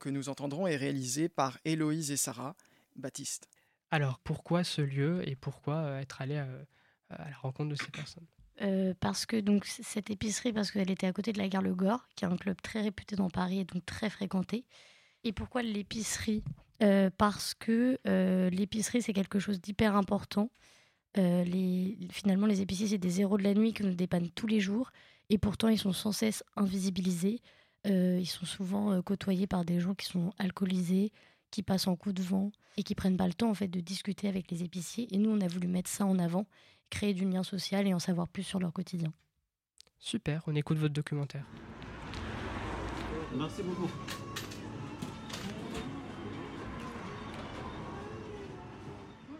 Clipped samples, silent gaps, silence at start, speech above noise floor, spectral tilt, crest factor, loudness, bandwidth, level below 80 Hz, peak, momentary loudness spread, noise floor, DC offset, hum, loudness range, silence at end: under 0.1%; none; 0 s; 52 dB; -5.5 dB/octave; 20 dB; -33 LUFS; 15.5 kHz; -58 dBFS; -14 dBFS; 13 LU; -84 dBFS; under 0.1%; none; 8 LU; 0 s